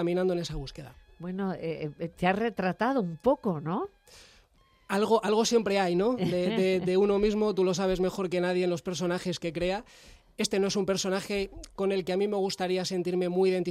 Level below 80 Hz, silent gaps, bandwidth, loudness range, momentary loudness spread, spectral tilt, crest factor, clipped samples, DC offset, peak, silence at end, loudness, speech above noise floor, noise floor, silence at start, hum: -52 dBFS; none; 14 kHz; 4 LU; 10 LU; -5 dB/octave; 18 dB; under 0.1%; under 0.1%; -12 dBFS; 0 s; -28 LUFS; 35 dB; -63 dBFS; 0 s; none